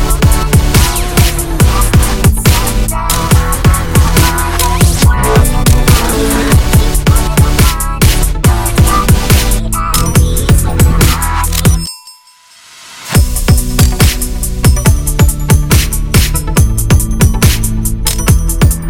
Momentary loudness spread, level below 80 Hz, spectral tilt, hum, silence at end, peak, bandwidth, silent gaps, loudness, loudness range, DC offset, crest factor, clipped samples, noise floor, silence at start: 4 LU; -12 dBFS; -4.5 dB/octave; none; 0 s; 0 dBFS; 17.5 kHz; none; -10 LUFS; 3 LU; under 0.1%; 8 dB; 0.3%; -41 dBFS; 0 s